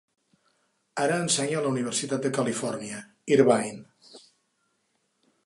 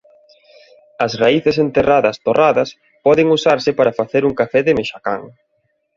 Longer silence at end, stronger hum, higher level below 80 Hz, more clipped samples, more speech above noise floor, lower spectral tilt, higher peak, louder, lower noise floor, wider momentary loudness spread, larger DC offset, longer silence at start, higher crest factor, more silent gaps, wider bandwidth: first, 1.25 s vs 0.7 s; neither; second, -76 dBFS vs -50 dBFS; neither; about the same, 48 dB vs 51 dB; second, -4 dB/octave vs -6 dB/octave; second, -6 dBFS vs -2 dBFS; second, -26 LUFS vs -15 LUFS; first, -74 dBFS vs -66 dBFS; first, 16 LU vs 9 LU; neither; about the same, 0.95 s vs 1 s; first, 22 dB vs 16 dB; neither; first, 11.5 kHz vs 7.4 kHz